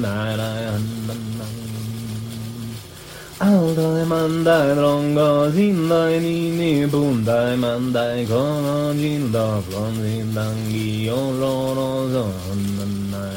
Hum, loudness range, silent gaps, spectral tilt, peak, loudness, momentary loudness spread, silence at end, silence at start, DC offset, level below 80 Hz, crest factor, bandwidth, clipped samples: none; 6 LU; none; -6.5 dB/octave; -4 dBFS; -20 LUFS; 12 LU; 0 s; 0 s; under 0.1%; -50 dBFS; 16 dB; 16.5 kHz; under 0.1%